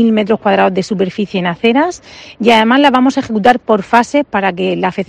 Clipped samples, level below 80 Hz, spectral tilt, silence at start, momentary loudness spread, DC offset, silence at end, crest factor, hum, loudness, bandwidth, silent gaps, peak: 0.3%; -50 dBFS; -5.5 dB/octave; 0 s; 8 LU; under 0.1%; 0.05 s; 12 dB; none; -12 LUFS; 10.5 kHz; none; 0 dBFS